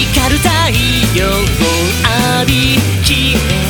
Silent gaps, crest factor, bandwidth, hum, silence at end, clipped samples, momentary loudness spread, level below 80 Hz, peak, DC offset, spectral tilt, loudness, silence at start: none; 12 dB; over 20 kHz; none; 0 s; under 0.1%; 2 LU; -20 dBFS; 0 dBFS; under 0.1%; -4 dB/octave; -11 LUFS; 0 s